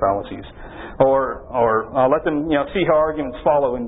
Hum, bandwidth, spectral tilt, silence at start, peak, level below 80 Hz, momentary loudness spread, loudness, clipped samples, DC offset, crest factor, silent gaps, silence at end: none; 4 kHz; -11.5 dB/octave; 0 s; 0 dBFS; -42 dBFS; 17 LU; -19 LUFS; under 0.1%; under 0.1%; 18 dB; none; 0 s